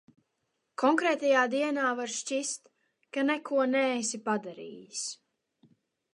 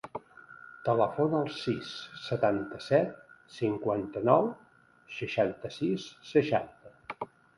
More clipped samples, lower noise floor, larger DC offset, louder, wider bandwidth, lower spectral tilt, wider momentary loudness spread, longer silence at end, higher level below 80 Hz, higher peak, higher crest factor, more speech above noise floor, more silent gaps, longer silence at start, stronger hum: neither; first, -80 dBFS vs -52 dBFS; neither; about the same, -29 LUFS vs -30 LUFS; about the same, 11.5 kHz vs 11.5 kHz; second, -2.5 dB/octave vs -7 dB/octave; second, 15 LU vs 18 LU; first, 1 s vs 0.35 s; second, -86 dBFS vs -66 dBFS; about the same, -10 dBFS vs -8 dBFS; about the same, 20 dB vs 22 dB; first, 51 dB vs 23 dB; neither; first, 0.8 s vs 0.05 s; neither